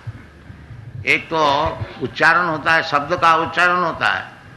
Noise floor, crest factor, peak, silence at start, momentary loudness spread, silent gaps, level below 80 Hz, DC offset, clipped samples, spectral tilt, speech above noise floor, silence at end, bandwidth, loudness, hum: -40 dBFS; 16 dB; -2 dBFS; 0.05 s; 11 LU; none; -46 dBFS; under 0.1%; under 0.1%; -4.5 dB/octave; 23 dB; 0 s; 12 kHz; -17 LUFS; none